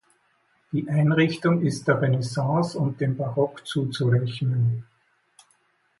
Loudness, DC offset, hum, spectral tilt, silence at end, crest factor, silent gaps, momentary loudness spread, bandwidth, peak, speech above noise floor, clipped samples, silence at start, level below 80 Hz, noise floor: -24 LUFS; under 0.1%; none; -7 dB/octave; 1.15 s; 16 dB; none; 6 LU; 11.5 kHz; -8 dBFS; 43 dB; under 0.1%; 0.7 s; -62 dBFS; -66 dBFS